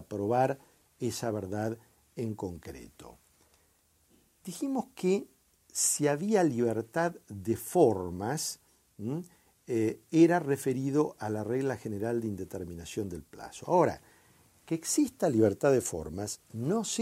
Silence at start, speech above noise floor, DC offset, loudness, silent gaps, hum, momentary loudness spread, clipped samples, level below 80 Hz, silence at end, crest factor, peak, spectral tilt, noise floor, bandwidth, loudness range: 0 s; 38 dB; under 0.1%; -31 LUFS; none; none; 15 LU; under 0.1%; -62 dBFS; 0 s; 22 dB; -10 dBFS; -5 dB/octave; -68 dBFS; 16 kHz; 9 LU